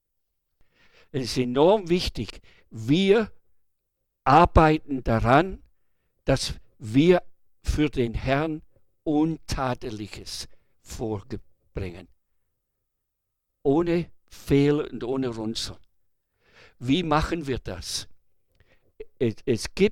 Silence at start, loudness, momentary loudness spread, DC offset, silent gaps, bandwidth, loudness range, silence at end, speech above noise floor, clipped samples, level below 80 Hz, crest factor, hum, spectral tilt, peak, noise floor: 1.15 s; -24 LUFS; 16 LU; under 0.1%; none; 15.5 kHz; 10 LU; 0 s; 56 dB; under 0.1%; -40 dBFS; 20 dB; none; -6 dB/octave; -6 dBFS; -80 dBFS